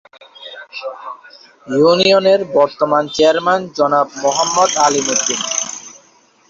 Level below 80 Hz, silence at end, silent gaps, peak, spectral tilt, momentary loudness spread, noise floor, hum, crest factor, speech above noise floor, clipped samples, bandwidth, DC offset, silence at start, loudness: -60 dBFS; 0.6 s; none; 0 dBFS; -2.5 dB/octave; 20 LU; -51 dBFS; none; 14 dB; 36 dB; under 0.1%; 7.8 kHz; under 0.1%; 0.4 s; -14 LUFS